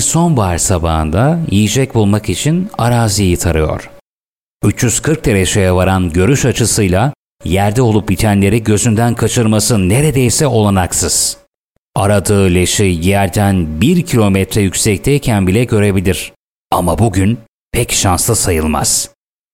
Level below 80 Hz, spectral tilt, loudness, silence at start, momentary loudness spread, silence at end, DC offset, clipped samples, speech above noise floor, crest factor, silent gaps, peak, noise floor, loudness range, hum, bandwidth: -30 dBFS; -5 dB/octave; -12 LUFS; 0 s; 5 LU; 0.45 s; under 0.1%; under 0.1%; over 78 dB; 12 dB; 4.01-4.59 s, 7.15-7.38 s, 11.47-11.93 s, 16.36-16.70 s, 17.48-17.71 s; 0 dBFS; under -90 dBFS; 2 LU; none; 17 kHz